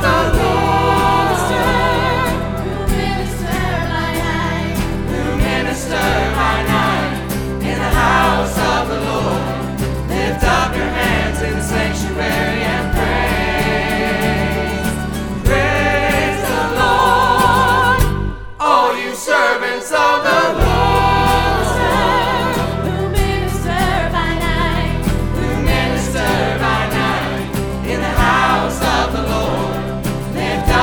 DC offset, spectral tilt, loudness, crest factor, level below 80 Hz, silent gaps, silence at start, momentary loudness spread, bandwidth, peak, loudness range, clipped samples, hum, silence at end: under 0.1%; -5 dB/octave; -16 LUFS; 16 dB; -24 dBFS; none; 0 s; 7 LU; over 20 kHz; 0 dBFS; 4 LU; under 0.1%; none; 0 s